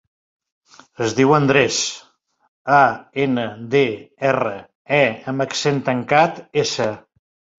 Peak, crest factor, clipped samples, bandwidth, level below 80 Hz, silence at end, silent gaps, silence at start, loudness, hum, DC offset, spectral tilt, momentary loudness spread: -2 dBFS; 18 dB; under 0.1%; 7.8 kHz; -58 dBFS; 0.6 s; 2.48-2.65 s, 4.75-4.85 s; 1 s; -18 LUFS; none; under 0.1%; -4.5 dB/octave; 10 LU